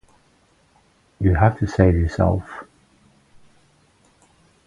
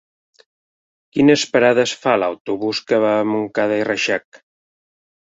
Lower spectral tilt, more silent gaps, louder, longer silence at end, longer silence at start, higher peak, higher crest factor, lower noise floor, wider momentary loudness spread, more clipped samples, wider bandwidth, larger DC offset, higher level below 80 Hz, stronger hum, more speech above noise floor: first, -9 dB/octave vs -4.5 dB/octave; second, none vs 2.40-2.45 s; about the same, -19 LUFS vs -18 LUFS; first, 2.05 s vs 1.15 s; about the same, 1.2 s vs 1.15 s; about the same, 0 dBFS vs -2 dBFS; about the same, 22 dB vs 18 dB; second, -59 dBFS vs under -90 dBFS; first, 14 LU vs 8 LU; neither; about the same, 7.6 kHz vs 8 kHz; neither; first, -32 dBFS vs -62 dBFS; neither; second, 41 dB vs over 73 dB